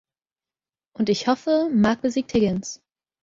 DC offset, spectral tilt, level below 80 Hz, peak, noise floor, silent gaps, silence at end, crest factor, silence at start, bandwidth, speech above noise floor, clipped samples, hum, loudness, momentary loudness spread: under 0.1%; -5.5 dB/octave; -54 dBFS; -6 dBFS; under -90 dBFS; none; 0.45 s; 18 dB; 1 s; 7.8 kHz; over 69 dB; under 0.1%; none; -22 LUFS; 10 LU